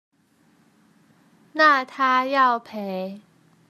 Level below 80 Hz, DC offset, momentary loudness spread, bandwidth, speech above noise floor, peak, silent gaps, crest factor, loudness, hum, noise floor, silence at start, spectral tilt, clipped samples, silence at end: -82 dBFS; under 0.1%; 15 LU; 13.5 kHz; 40 dB; -4 dBFS; none; 20 dB; -20 LUFS; none; -61 dBFS; 1.55 s; -4.5 dB/octave; under 0.1%; 0.5 s